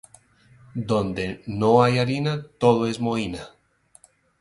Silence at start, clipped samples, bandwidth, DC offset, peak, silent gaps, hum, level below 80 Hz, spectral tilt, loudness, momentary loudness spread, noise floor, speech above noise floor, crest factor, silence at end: 0.75 s; under 0.1%; 11.5 kHz; under 0.1%; -4 dBFS; none; none; -52 dBFS; -6.5 dB/octave; -22 LUFS; 14 LU; -56 dBFS; 34 dB; 20 dB; 0.95 s